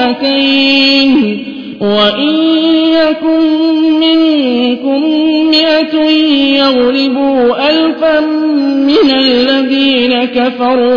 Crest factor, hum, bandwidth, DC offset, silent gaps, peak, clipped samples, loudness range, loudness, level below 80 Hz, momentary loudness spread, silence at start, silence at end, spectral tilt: 10 dB; none; 5.2 kHz; under 0.1%; none; 0 dBFS; under 0.1%; 1 LU; -9 LUFS; -48 dBFS; 4 LU; 0 s; 0 s; -5.5 dB/octave